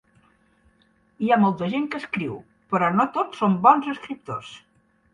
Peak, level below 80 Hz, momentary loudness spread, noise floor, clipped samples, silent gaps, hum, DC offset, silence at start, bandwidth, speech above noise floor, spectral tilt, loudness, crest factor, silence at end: -2 dBFS; -64 dBFS; 16 LU; -62 dBFS; under 0.1%; none; none; under 0.1%; 1.2 s; 9.8 kHz; 40 dB; -7.5 dB/octave; -22 LUFS; 22 dB; 0.55 s